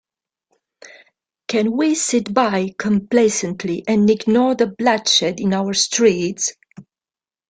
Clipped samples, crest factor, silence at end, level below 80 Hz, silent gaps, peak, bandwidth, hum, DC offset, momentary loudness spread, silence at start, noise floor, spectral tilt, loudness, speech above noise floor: under 0.1%; 16 dB; 0.7 s; -60 dBFS; none; -2 dBFS; 9.6 kHz; none; under 0.1%; 8 LU; 0.85 s; under -90 dBFS; -3.5 dB/octave; -17 LUFS; over 73 dB